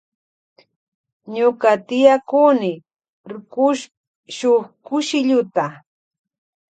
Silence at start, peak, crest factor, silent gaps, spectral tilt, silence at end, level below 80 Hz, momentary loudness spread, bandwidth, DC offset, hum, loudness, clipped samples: 1.25 s; 0 dBFS; 20 dB; 3.09-3.24 s, 3.97-4.23 s; -4.5 dB/octave; 0.95 s; -72 dBFS; 19 LU; 9.2 kHz; under 0.1%; none; -18 LUFS; under 0.1%